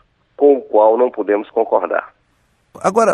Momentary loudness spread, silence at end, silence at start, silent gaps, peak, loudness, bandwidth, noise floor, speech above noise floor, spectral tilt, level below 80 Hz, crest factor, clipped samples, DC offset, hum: 8 LU; 0 s; 0.4 s; none; -2 dBFS; -16 LUFS; 11 kHz; -60 dBFS; 46 dB; -5.5 dB/octave; -66 dBFS; 14 dB; under 0.1%; under 0.1%; none